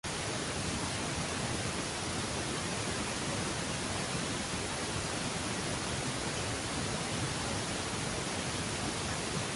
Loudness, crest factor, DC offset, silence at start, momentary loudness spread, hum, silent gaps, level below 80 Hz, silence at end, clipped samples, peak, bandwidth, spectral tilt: -34 LUFS; 14 dB; under 0.1%; 0.05 s; 1 LU; none; none; -50 dBFS; 0 s; under 0.1%; -22 dBFS; 12 kHz; -3 dB/octave